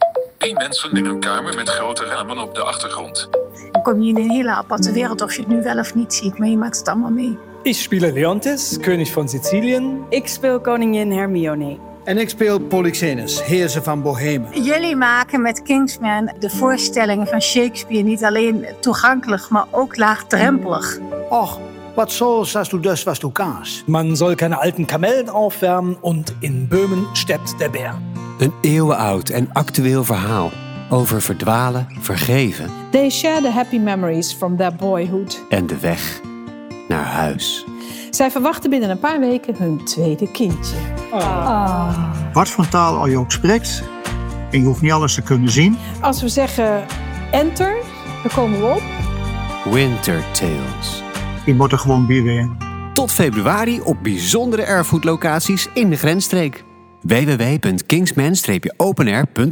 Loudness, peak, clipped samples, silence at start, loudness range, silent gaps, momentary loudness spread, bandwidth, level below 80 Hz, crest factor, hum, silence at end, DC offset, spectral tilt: -18 LUFS; -2 dBFS; under 0.1%; 0 s; 3 LU; none; 8 LU; over 20 kHz; -38 dBFS; 16 dB; none; 0 s; under 0.1%; -5 dB/octave